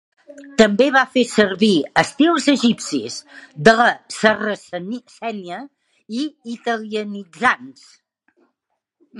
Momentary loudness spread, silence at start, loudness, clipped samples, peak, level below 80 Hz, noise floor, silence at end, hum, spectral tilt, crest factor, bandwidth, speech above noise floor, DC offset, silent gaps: 16 LU; 0.3 s; -18 LUFS; under 0.1%; 0 dBFS; -60 dBFS; -76 dBFS; 0 s; none; -4 dB/octave; 20 dB; 11.5 kHz; 58 dB; under 0.1%; none